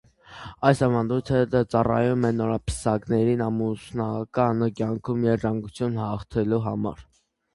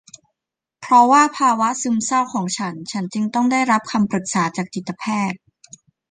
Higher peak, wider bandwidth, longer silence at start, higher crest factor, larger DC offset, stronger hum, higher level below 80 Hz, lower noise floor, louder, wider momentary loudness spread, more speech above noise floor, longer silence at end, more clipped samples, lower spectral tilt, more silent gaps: about the same, -4 dBFS vs -2 dBFS; first, 11.5 kHz vs 9.8 kHz; second, 0.3 s vs 0.8 s; about the same, 20 dB vs 18 dB; neither; neither; first, -46 dBFS vs -64 dBFS; second, -43 dBFS vs -85 dBFS; second, -24 LUFS vs -18 LUFS; second, 7 LU vs 13 LU; second, 19 dB vs 66 dB; second, 0.5 s vs 0.75 s; neither; first, -7.5 dB/octave vs -4 dB/octave; neither